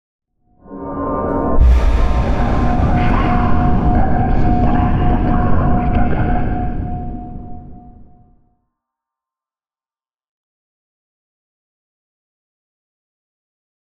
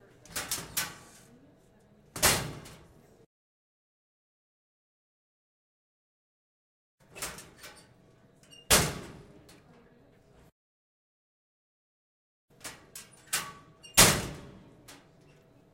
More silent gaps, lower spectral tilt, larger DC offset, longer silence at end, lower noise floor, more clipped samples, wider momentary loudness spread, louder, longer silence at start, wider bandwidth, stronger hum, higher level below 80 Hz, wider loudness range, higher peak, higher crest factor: second, none vs 3.26-6.98 s, 10.52-12.48 s; first, -9 dB/octave vs -1.5 dB/octave; neither; first, 3.7 s vs 0.8 s; first, under -90 dBFS vs -61 dBFS; neither; second, 14 LU vs 28 LU; first, -17 LUFS vs -27 LUFS; about the same, 0.2 s vs 0.3 s; second, 6.2 kHz vs 16 kHz; neither; first, -20 dBFS vs -52 dBFS; second, 12 LU vs 19 LU; about the same, -2 dBFS vs -2 dBFS; second, 14 dB vs 34 dB